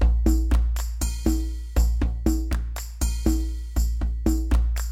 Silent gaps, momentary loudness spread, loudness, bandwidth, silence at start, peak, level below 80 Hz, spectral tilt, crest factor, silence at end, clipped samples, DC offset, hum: none; 6 LU; -26 LUFS; 16 kHz; 0 s; -6 dBFS; -22 dBFS; -6 dB/octave; 16 dB; 0 s; under 0.1%; under 0.1%; none